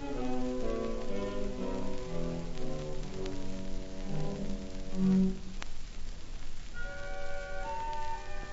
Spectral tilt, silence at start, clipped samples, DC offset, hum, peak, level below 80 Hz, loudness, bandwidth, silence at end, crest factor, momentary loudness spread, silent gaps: -6.5 dB/octave; 0 s; under 0.1%; under 0.1%; none; -18 dBFS; -38 dBFS; -37 LUFS; 7.6 kHz; 0 s; 14 dB; 13 LU; none